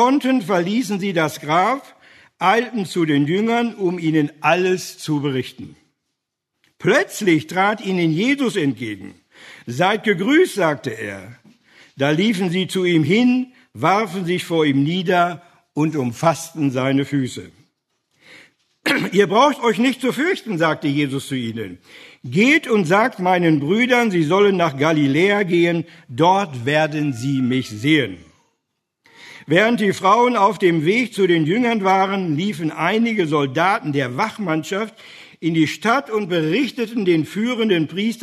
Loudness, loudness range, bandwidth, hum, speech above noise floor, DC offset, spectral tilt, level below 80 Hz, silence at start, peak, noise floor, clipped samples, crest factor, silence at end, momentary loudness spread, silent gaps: -18 LUFS; 4 LU; 13.5 kHz; none; 60 dB; under 0.1%; -5.5 dB/octave; -66 dBFS; 0 s; -2 dBFS; -78 dBFS; under 0.1%; 18 dB; 0 s; 9 LU; none